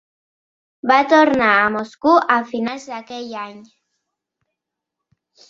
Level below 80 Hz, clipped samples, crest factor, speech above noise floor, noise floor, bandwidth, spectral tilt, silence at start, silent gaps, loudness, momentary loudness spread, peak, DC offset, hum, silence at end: -62 dBFS; under 0.1%; 18 dB; 65 dB; -82 dBFS; 7.6 kHz; -4.5 dB/octave; 0.85 s; none; -16 LUFS; 17 LU; 0 dBFS; under 0.1%; none; 1.9 s